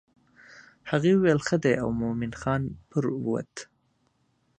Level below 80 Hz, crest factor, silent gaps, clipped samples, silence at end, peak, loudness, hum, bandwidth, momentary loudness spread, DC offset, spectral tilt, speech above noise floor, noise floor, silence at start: -54 dBFS; 20 dB; none; under 0.1%; 0.95 s; -8 dBFS; -26 LUFS; none; 9.4 kHz; 11 LU; under 0.1%; -6.5 dB/octave; 45 dB; -70 dBFS; 0.55 s